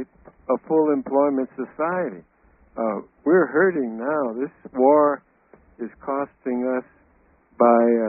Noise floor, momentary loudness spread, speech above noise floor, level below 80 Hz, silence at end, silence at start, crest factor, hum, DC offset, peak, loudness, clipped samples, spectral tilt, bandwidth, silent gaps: -59 dBFS; 15 LU; 38 dB; -64 dBFS; 0 s; 0 s; 20 dB; none; under 0.1%; -4 dBFS; -22 LUFS; under 0.1%; -1.5 dB/octave; 2.7 kHz; none